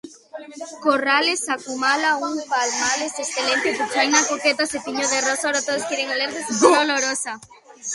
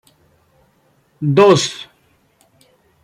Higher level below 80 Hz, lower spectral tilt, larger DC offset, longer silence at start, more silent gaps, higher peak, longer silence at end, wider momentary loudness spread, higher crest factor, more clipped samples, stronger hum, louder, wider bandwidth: about the same, -66 dBFS vs -62 dBFS; second, -0.5 dB/octave vs -5 dB/octave; neither; second, 0.05 s vs 1.2 s; neither; about the same, 0 dBFS vs -2 dBFS; second, 0 s vs 1.2 s; second, 12 LU vs 23 LU; about the same, 22 dB vs 18 dB; neither; neither; second, -20 LUFS vs -14 LUFS; about the same, 11.5 kHz vs 12 kHz